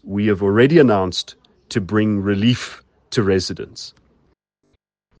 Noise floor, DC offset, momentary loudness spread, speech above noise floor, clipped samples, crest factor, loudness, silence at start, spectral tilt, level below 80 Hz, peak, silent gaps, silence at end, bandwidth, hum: -66 dBFS; under 0.1%; 19 LU; 49 dB; under 0.1%; 18 dB; -18 LUFS; 0.05 s; -6 dB/octave; -56 dBFS; 0 dBFS; none; 1.3 s; 9.6 kHz; none